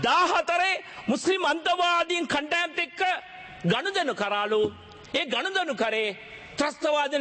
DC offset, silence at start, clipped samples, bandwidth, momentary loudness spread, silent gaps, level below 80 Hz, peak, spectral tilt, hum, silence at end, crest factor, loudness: under 0.1%; 0 s; under 0.1%; 8.8 kHz; 8 LU; none; -64 dBFS; -12 dBFS; -3.5 dB/octave; none; 0 s; 14 dB; -26 LUFS